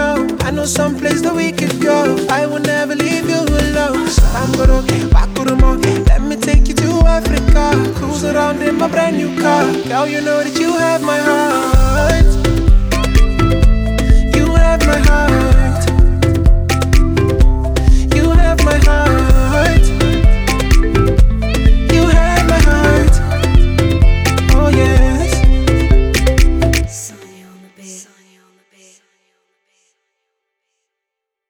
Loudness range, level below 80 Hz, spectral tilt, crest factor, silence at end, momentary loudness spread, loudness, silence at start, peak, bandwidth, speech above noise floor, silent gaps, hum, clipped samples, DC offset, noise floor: 3 LU; -14 dBFS; -5.5 dB/octave; 12 dB; 3.45 s; 4 LU; -13 LUFS; 0 s; 0 dBFS; 16.5 kHz; 68 dB; none; none; under 0.1%; under 0.1%; -80 dBFS